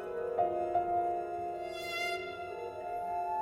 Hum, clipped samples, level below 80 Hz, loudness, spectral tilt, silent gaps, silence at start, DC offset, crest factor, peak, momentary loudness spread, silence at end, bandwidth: none; under 0.1%; -66 dBFS; -35 LUFS; -4.5 dB/octave; none; 0 s; under 0.1%; 16 dB; -20 dBFS; 9 LU; 0 s; 16 kHz